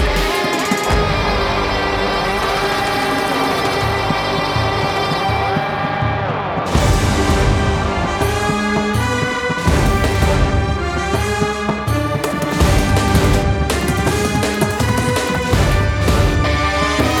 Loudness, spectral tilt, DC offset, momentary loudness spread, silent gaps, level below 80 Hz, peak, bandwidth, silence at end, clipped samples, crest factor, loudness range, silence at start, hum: -17 LUFS; -5 dB/octave; under 0.1%; 4 LU; none; -24 dBFS; -4 dBFS; 18 kHz; 0 s; under 0.1%; 12 dB; 1 LU; 0 s; none